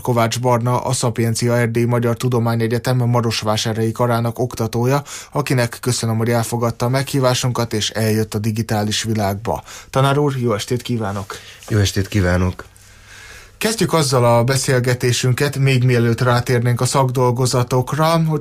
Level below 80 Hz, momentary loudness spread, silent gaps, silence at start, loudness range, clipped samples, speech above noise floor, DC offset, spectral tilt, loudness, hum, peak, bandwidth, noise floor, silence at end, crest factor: -46 dBFS; 6 LU; none; 0 s; 4 LU; under 0.1%; 25 dB; under 0.1%; -5.5 dB/octave; -18 LUFS; none; -4 dBFS; 15.5 kHz; -42 dBFS; 0 s; 14 dB